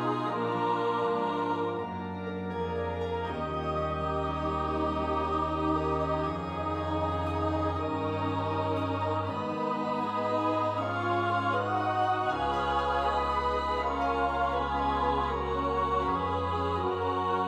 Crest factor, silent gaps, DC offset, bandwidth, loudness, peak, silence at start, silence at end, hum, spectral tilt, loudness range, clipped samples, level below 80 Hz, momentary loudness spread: 14 dB; none; under 0.1%; 11.5 kHz; -30 LUFS; -16 dBFS; 0 s; 0 s; none; -7 dB/octave; 3 LU; under 0.1%; -46 dBFS; 5 LU